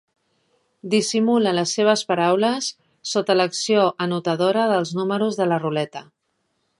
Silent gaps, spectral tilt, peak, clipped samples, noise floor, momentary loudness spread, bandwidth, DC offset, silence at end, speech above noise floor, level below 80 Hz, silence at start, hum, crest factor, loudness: none; -4.5 dB/octave; -4 dBFS; under 0.1%; -72 dBFS; 8 LU; 11.5 kHz; under 0.1%; 0.75 s; 52 dB; -72 dBFS; 0.85 s; none; 18 dB; -20 LUFS